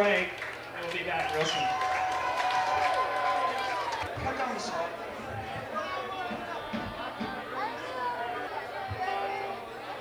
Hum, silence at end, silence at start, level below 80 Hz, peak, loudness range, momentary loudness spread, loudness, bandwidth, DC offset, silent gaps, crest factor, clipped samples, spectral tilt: none; 0 s; 0 s; -58 dBFS; -14 dBFS; 6 LU; 9 LU; -32 LUFS; over 20 kHz; under 0.1%; none; 18 dB; under 0.1%; -3.5 dB/octave